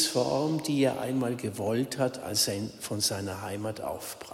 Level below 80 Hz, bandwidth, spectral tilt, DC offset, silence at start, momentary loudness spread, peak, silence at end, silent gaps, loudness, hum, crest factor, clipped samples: -66 dBFS; 16 kHz; -4 dB/octave; under 0.1%; 0 s; 8 LU; -12 dBFS; 0 s; none; -30 LUFS; none; 18 dB; under 0.1%